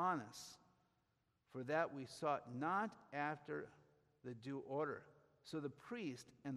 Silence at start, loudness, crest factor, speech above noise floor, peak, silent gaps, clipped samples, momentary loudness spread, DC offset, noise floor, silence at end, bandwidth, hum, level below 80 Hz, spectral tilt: 0 s; -46 LUFS; 22 dB; 38 dB; -26 dBFS; none; under 0.1%; 15 LU; under 0.1%; -84 dBFS; 0 s; 13.5 kHz; none; -86 dBFS; -5.5 dB/octave